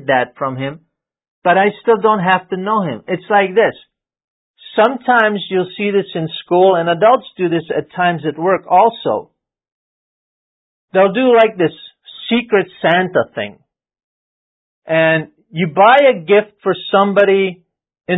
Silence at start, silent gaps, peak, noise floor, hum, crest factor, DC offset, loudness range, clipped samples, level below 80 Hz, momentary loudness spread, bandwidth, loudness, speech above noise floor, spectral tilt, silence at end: 0.05 s; 1.28-1.42 s, 4.24-4.54 s, 9.72-10.88 s, 14.04-14.82 s; 0 dBFS; under -90 dBFS; none; 16 dB; under 0.1%; 4 LU; under 0.1%; -62 dBFS; 11 LU; 4 kHz; -14 LUFS; over 76 dB; -8.5 dB/octave; 0 s